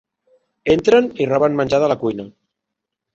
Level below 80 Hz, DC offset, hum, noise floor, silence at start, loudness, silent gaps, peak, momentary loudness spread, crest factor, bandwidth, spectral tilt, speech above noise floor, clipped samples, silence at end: -50 dBFS; under 0.1%; none; -81 dBFS; 0.65 s; -17 LUFS; none; -2 dBFS; 11 LU; 16 dB; 7.8 kHz; -6 dB/octave; 65 dB; under 0.1%; 0.85 s